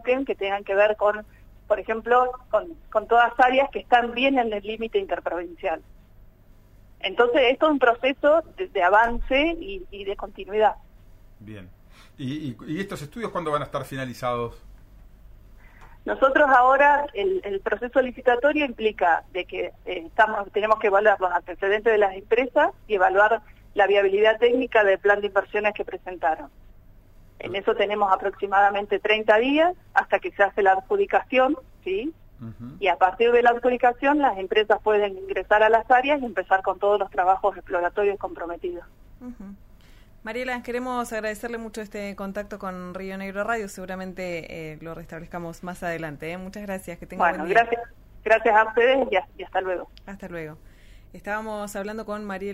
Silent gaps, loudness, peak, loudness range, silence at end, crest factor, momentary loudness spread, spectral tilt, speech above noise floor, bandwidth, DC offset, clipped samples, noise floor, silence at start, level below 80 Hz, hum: none; -23 LUFS; -6 dBFS; 11 LU; 0 s; 18 dB; 16 LU; -5 dB/octave; 29 dB; 15.5 kHz; under 0.1%; under 0.1%; -52 dBFS; 0.05 s; -48 dBFS; none